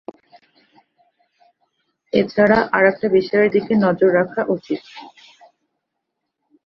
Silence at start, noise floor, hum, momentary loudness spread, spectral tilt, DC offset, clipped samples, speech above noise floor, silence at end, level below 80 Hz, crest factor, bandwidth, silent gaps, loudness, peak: 2.15 s; -78 dBFS; none; 13 LU; -8 dB/octave; under 0.1%; under 0.1%; 61 dB; 1.55 s; -56 dBFS; 18 dB; 6.6 kHz; none; -17 LUFS; -2 dBFS